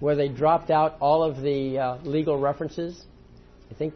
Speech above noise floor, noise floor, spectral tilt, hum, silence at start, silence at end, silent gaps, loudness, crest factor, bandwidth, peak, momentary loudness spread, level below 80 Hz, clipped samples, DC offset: 26 dB; -50 dBFS; -8 dB/octave; none; 0 s; 0 s; none; -24 LUFS; 16 dB; 6.4 kHz; -8 dBFS; 10 LU; -52 dBFS; under 0.1%; under 0.1%